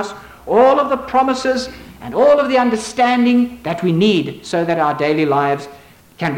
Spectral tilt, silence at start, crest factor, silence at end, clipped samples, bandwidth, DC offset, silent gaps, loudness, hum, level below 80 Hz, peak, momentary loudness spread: -5.5 dB/octave; 0 s; 12 dB; 0 s; under 0.1%; 16.5 kHz; under 0.1%; none; -16 LUFS; none; -50 dBFS; -2 dBFS; 12 LU